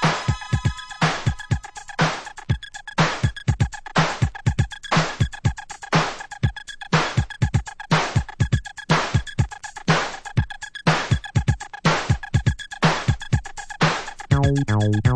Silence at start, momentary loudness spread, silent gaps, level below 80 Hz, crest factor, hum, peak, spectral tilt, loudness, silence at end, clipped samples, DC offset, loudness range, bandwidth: 0 s; 7 LU; none; -34 dBFS; 18 dB; none; -4 dBFS; -5.5 dB/octave; -23 LUFS; 0 s; under 0.1%; under 0.1%; 2 LU; 10 kHz